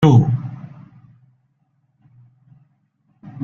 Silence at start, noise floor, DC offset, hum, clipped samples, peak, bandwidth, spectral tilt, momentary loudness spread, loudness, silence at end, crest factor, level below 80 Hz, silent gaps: 0 s; -65 dBFS; under 0.1%; none; under 0.1%; -2 dBFS; 6.8 kHz; -9 dB/octave; 30 LU; -17 LUFS; 0 s; 20 dB; -52 dBFS; none